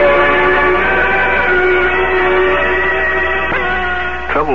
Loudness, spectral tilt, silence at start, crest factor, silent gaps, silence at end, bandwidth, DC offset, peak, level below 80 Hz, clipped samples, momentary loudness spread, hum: -12 LUFS; -6.5 dB/octave; 0 s; 12 dB; none; 0 s; 7 kHz; 5%; 0 dBFS; -30 dBFS; under 0.1%; 5 LU; none